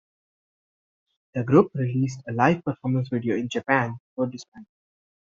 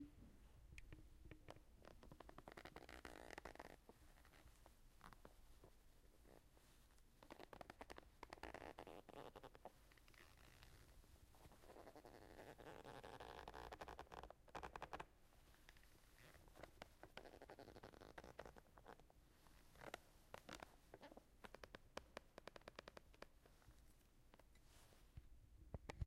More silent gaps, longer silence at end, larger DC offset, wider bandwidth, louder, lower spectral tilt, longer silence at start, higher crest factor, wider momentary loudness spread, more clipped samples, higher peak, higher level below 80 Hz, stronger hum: first, 4.00-4.16 s, 4.48-4.52 s vs none; first, 0.75 s vs 0 s; neither; second, 7.6 kHz vs 15.5 kHz; first, -24 LUFS vs -62 LUFS; first, -6.5 dB/octave vs -4.5 dB/octave; first, 1.35 s vs 0 s; second, 22 dB vs 28 dB; about the same, 11 LU vs 10 LU; neither; first, -4 dBFS vs -34 dBFS; about the same, -64 dBFS vs -68 dBFS; neither